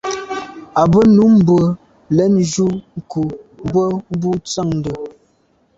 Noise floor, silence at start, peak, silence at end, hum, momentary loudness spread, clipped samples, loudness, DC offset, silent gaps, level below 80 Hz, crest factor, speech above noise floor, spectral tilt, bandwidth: -58 dBFS; 0.05 s; -2 dBFS; 0.7 s; none; 17 LU; under 0.1%; -15 LUFS; under 0.1%; none; -44 dBFS; 14 dB; 44 dB; -7 dB/octave; 8 kHz